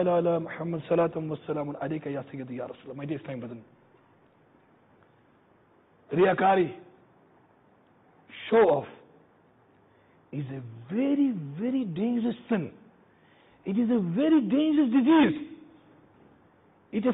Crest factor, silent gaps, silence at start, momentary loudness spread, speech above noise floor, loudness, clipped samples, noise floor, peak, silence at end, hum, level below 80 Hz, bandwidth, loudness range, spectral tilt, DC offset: 18 dB; none; 0 s; 18 LU; 36 dB; -27 LUFS; under 0.1%; -62 dBFS; -12 dBFS; 0 s; none; -68 dBFS; 4 kHz; 13 LU; -11 dB/octave; under 0.1%